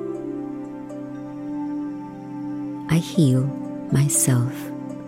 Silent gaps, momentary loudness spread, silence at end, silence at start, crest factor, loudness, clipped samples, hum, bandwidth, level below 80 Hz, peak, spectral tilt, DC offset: none; 15 LU; 0 s; 0 s; 18 dB; -24 LUFS; under 0.1%; none; 16 kHz; -56 dBFS; -6 dBFS; -5.5 dB/octave; under 0.1%